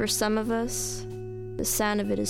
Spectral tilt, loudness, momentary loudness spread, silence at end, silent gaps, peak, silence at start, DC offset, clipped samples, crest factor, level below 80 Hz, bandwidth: -3.5 dB/octave; -28 LUFS; 12 LU; 0 s; none; -12 dBFS; 0 s; under 0.1%; under 0.1%; 16 dB; -44 dBFS; 17.5 kHz